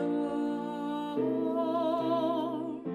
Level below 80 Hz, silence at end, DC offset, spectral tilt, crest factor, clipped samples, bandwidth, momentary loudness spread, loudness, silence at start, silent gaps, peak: -76 dBFS; 0 s; under 0.1%; -7.5 dB/octave; 12 dB; under 0.1%; 12.5 kHz; 5 LU; -31 LUFS; 0 s; none; -20 dBFS